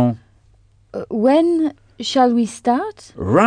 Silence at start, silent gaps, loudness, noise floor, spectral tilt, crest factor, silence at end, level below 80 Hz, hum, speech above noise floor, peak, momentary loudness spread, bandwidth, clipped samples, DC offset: 0 s; none; -18 LUFS; -53 dBFS; -6 dB/octave; 16 dB; 0 s; -52 dBFS; none; 36 dB; -2 dBFS; 15 LU; 10 kHz; under 0.1%; under 0.1%